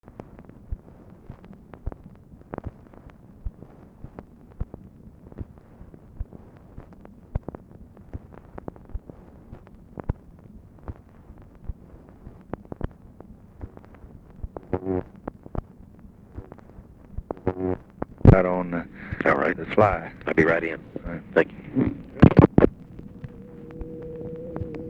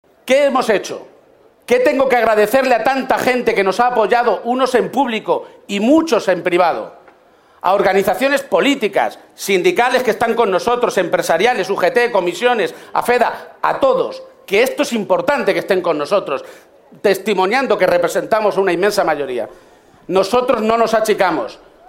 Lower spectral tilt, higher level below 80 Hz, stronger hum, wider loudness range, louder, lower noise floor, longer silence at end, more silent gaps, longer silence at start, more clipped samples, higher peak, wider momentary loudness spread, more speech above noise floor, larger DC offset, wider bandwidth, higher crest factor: first, -10 dB/octave vs -4 dB/octave; first, -38 dBFS vs -54 dBFS; neither; first, 21 LU vs 2 LU; second, -24 LUFS vs -15 LUFS; about the same, -48 dBFS vs -50 dBFS; second, 0 s vs 0.35 s; neither; first, 0.4 s vs 0.25 s; neither; about the same, 0 dBFS vs 0 dBFS; first, 26 LU vs 7 LU; second, 25 dB vs 35 dB; neither; second, 6.4 kHz vs 16.5 kHz; first, 26 dB vs 16 dB